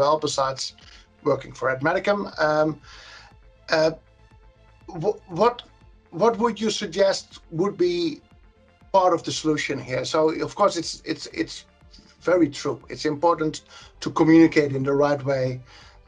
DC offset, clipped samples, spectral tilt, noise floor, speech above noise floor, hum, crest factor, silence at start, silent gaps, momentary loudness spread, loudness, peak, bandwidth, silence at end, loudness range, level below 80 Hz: under 0.1%; under 0.1%; -5 dB/octave; -54 dBFS; 31 dB; none; 20 dB; 0 s; none; 12 LU; -23 LUFS; -4 dBFS; 10 kHz; 0.45 s; 5 LU; -54 dBFS